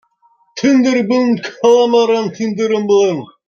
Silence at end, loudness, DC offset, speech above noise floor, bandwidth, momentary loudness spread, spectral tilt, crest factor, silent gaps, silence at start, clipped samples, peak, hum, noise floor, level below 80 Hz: 0.2 s; -13 LUFS; under 0.1%; 43 dB; 7.2 kHz; 7 LU; -5 dB/octave; 12 dB; none; 0.55 s; under 0.1%; -2 dBFS; none; -56 dBFS; -64 dBFS